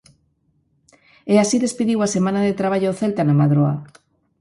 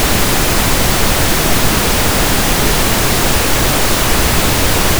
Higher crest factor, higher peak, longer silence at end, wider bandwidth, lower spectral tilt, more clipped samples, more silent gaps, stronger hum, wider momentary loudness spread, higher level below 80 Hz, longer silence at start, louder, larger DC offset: first, 18 dB vs 12 dB; about the same, -2 dBFS vs 0 dBFS; first, 0.55 s vs 0 s; second, 11.5 kHz vs over 20 kHz; first, -6.5 dB/octave vs -3 dB/octave; neither; neither; neither; first, 5 LU vs 0 LU; second, -58 dBFS vs -20 dBFS; first, 1.25 s vs 0 s; second, -19 LUFS vs -12 LUFS; neither